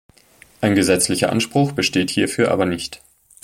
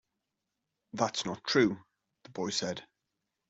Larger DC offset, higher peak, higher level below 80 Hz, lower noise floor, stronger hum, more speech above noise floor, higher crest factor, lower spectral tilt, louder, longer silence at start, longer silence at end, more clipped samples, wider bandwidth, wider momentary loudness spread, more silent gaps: neither; first, -2 dBFS vs -12 dBFS; first, -52 dBFS vs -72 dBFS; second, -51 dBFS vs -86 dBFS; neither; second, 33 dB vs 55 dB; about the same, 18 dB vs 22 dB; about the same, -4 dB/octave vs -4 dB/octave; first, -18 LUFS vs -31 LUFS; second, 0.6 s vs 0.95 s; second, 0.45 s vs 0.65 s; neither; first, 16.5 kHz vs 8.2 kHz; second, 7 LU vs 17 LU; neither